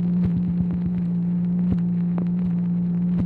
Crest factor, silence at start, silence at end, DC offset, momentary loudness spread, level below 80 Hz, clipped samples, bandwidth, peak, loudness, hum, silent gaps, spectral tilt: 12 dB; 0 s; 0 s; under 0.1%; 2 LU; -42 dBFS; under 0.1%; 2.7 kHz; -10 dBFS; -23 LUFS; none; none; -12.5 dB/octave